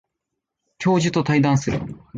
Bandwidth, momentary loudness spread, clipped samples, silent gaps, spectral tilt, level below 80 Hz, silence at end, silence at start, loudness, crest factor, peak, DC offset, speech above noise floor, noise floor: 9 kHz; 8 LU; under 0.1%; none; -6 dB/octave; -48 dBFS; 0 s; 0.8 s; -20 LUFS; 14 dB; -6 dBFS; under 0.1%; 61 dB; -81 dBFS